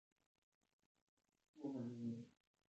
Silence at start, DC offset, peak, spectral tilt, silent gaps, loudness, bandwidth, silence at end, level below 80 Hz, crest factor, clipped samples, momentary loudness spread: 1.55 s; under 0.1%; -36 dBFS; -8.5 dB/octave; none; -50 LUFS; 8 kHz; 0.4 s; under -90 dBFS; 18 dB; under 0.1%; 8 LU